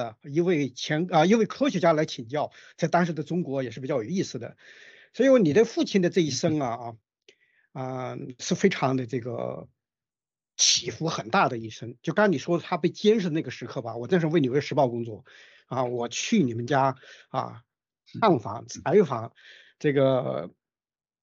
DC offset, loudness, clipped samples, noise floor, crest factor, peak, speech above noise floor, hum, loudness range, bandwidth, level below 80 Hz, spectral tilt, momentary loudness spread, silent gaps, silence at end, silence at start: under 0.1%; -25 LUFS; under 0.1%; under -90 dBFS; 20 dB; -8 dBFS; over 65 dB; none; 4 LU; 8.2 kHz; -70 dBFS; -5 dB/octave; 14 LU; none; 0.75 s; 0 s